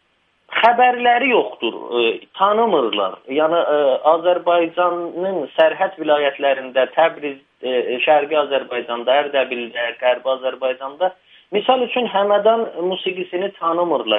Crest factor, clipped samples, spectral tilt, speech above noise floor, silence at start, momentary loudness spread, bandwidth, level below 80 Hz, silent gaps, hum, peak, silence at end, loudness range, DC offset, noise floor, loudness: 18 dB; under 0.1%; -6.5 dB/octave; 42 dB; 0.5 s; 8 LU; 5 kHz; -74 dBFS; none; none; 0 dBFS; 0 s; 3 LU; under 0.1%; -59 dBFS; -18 LUFS